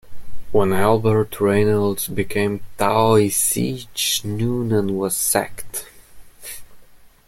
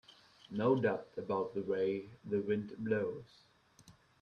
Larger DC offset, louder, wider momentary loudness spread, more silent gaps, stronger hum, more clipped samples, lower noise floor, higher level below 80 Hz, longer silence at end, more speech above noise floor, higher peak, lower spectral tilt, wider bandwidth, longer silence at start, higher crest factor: neither; first, -19 LUFS vs -36 LUFS; first, 15 LU vs 9 LU; neither; neither; neither; second, -45 dBFS vs -64 dBFS; first, -46 dBFS vs -74 dBFS; about the same, 0.2 s vs 0.3 s; about the same, 26 dB vs 28 dB; first, -2 dBFS vs -20 dBFS; second, -4.5 dB/octave vs -8 dB/octave; first, 16.5 kHz vs 9 kHz; about the same, 0.05 s vs 0.1 s; about the same, 18 dB vs 18 dB